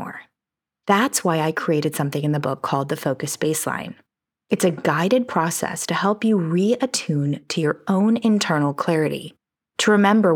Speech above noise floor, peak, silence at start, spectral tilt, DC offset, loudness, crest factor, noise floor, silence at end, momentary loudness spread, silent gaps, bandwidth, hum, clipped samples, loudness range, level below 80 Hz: 67 dB; -4 dBFS; 0 s; -5 dB/octave; under 0.1%; -21 LUFS; 18 dB; -87 dBFS; 0 s; 8 LU; none; over 20 kHz; none; under 0.1%; 3 LU; -72 dBFS